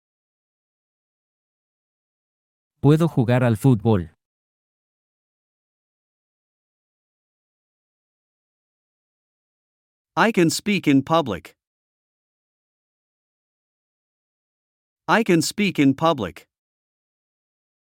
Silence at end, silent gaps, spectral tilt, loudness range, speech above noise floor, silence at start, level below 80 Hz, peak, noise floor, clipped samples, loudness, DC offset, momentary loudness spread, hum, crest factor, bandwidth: 1.7 s; 4.25-10.05 s, 11.67-14.96 s; -6 dB/octave; 6 LU; over 71 dB; 2.85 s; -62 dBFS; -4 dBFS; under -90 dBFS; under 0.1%; -20 LUFS; under 0.1%; 12 LU; none; 22 dB; 16.5 kHz